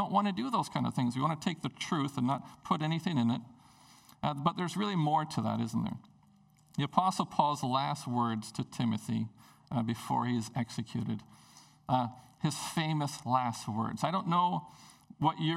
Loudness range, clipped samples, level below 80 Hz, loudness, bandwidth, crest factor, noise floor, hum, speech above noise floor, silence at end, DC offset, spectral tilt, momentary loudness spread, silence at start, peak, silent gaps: 3 LU; under 0.1%; -70 dBFS; -33 LUFS; 15 kHz; 22 dB; -64 dBFS; none; 31 dB; 0 s; under 0.1%; -6 dB/octave; 8 LU; 0 s; -10 dBFS; none